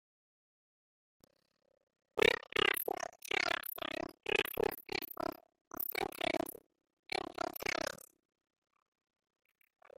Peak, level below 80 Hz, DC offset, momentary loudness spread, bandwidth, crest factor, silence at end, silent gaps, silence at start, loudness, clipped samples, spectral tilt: -12 dBFS; -68 dBFS; under 0.1%; 11 LU; 16.5 kHz; 28 dB; 2 s; 5.61-5.71 s, 6.93-7.03 s; 2.15 s; -36 LUFS; under 0.1%; -2.5 dB/octave